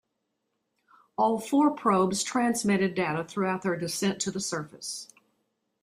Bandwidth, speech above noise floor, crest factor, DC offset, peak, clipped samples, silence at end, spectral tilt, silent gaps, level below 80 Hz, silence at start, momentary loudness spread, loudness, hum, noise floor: 15.5 kHz; 53 dB; 18 dB; under 0.1%; -10 dBFS; under 0.1%; 0.8 s; -4.5 dB/octave; none; -68 dBFS; 1.2 s; 12 LU; -27 LUFS; none; -80 dBFS